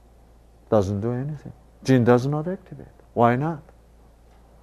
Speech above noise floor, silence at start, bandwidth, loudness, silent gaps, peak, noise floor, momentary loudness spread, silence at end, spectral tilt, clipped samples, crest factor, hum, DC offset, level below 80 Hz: 30 dB; 0.7 s; 13 kHz; -23 LUFS; none; -2 dBFS; -52 dBFS; 19 LU; 1.05 s; -8 dB/octave; under 0.1%; 22 dB; none; under 0.1%; -52 dBFS